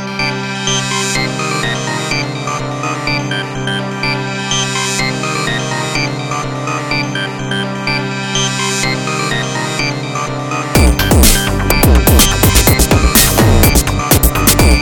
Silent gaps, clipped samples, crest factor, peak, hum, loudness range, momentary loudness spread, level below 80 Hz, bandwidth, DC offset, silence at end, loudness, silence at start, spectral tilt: none; 0.1%; 12 dB; 0 dBFS; none; 7 LU; 10 LU; -20 dBFS; over 20 kHz; under 0.1%; 0 s; -13 LUFS; 0 s; -3.5 dB/octave